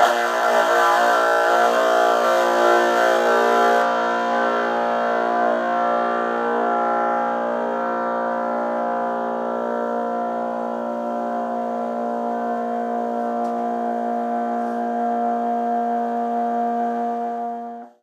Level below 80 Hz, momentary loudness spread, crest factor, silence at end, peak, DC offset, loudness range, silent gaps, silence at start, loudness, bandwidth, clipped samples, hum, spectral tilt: -84 dBFS; 8 LU; 18 dB; 0.15 s; -4 dBFS; under 0.1%; 8 LU; none; 0 s; -21 LUFS; 15 kHz; under 0.1%; none; -3.5 dB/octave